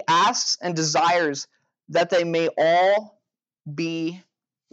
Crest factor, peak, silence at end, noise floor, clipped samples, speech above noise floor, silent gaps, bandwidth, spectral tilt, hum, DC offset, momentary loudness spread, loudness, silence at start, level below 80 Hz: 14 dB; -10 dBFS; 0.55 s; -54 dBFS; under 0.1%; 32 dB; none; 8.8 kHz; -3 dB/octave; none; under 0.1%; 12 LU; -21 LUFS; 0 s; -82 dBFS